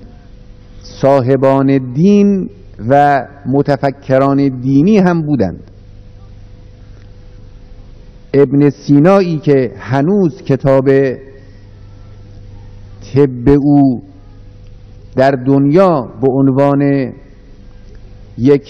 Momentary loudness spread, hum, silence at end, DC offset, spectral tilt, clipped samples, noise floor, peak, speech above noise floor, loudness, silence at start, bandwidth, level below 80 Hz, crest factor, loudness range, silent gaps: 8 LU; 50 Hz at -40 dBFS; 0.1 s; under 0.1%; -9 dB/octave; 0.7%; -36 dBFS; 0 dBFS; 25 dB; -12 LUFS; 0 s; 6.4 kHz; -38 dBFS; 12 dB; 4 LU; none